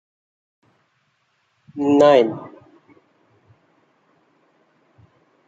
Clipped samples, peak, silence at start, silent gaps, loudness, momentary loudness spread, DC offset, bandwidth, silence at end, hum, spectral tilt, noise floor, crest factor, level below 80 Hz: under 0.1%; -2 dBFS; 1.75 s; none; -16 LUFS; 26 LU; under 0.1%; 7.8 kHz; 3 s; none; -6 dB/octave; -67 dBFS; 22 dB; -70 dBFS